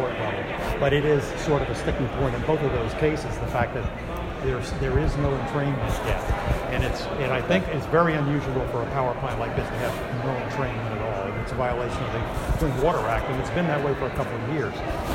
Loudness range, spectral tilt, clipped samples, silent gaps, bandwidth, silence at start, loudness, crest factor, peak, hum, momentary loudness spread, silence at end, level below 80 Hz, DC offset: 3 LU; -6.5 dB/octave; under 0.1%; none; 16 kHz; 0 s; -26 LUFS; 18 dB; -8 dBFS; none; 6 LU; 0 s; -34 dBFS; under 0.1%